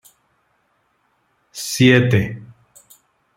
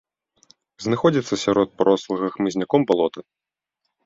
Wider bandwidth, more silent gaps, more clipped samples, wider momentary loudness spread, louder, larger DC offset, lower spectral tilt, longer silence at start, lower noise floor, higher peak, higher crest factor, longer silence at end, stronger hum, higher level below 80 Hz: first, 16.5 kHz vs 7.8 kHz; neither; neither; first, 23 LU vs 7 LU; first, -16 LUFS vs -21 LUFS; neither; about the same, -5.5 dB/octave vs -6 dB/octave; first, 1.55 s vs 0.8 s; second, -65 dBFS vs -79 dBFS; about the same, -2 dBFS vs -2 dBFS; about the same, 20 dB vs 20 dB; about the same, 0.9 s vs 0.85 s; neither; first, -54 dBFS vs -60 dBFS